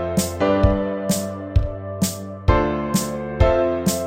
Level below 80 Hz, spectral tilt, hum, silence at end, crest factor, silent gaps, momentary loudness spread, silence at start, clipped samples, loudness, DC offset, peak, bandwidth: -28 dBFS; -5.5 dB/octave; none; 0 s; 18 dB; none; 6 LU; 0 s; under 0.1%; -21 LUFS; under 0.1%; -2 dBFS; 16.5 kHz